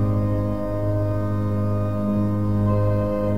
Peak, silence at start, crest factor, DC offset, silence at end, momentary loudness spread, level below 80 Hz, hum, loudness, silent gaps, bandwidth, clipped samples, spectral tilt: -10 dBFS; 0 s; 10 dB; 2%; 0 s; 3 LU; -36 dBFS; none; -23 LUFS; none; 5.2 kHz; under 0.1%; -10.5 dB/octave